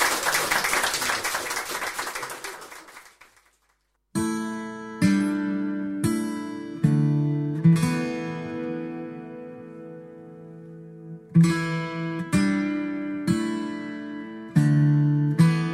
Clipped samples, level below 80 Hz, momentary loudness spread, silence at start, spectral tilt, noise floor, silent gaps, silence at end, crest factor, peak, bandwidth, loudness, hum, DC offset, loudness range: under 0.1%; -58 dBFS; 21 LU; 0 s; -5.5 dB/octave; -70 dBFS; none; 0 s; 18 dB; -6 dBFS; 16 kHz; -25 LUFS; none; under 0.1%; 8 LU